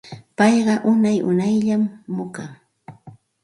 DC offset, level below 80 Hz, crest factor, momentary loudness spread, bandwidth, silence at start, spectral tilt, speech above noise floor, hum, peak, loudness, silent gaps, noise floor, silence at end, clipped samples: under 0.1%; -64 dBFS; 18 dB; 17 LU; 11.5 kHz; 0.05 s; -6.5 dB/octave; 27 dB; none; -4 dBFS; -19 LUFS; none; -46 dBFS; 0.35 s; under 0.1%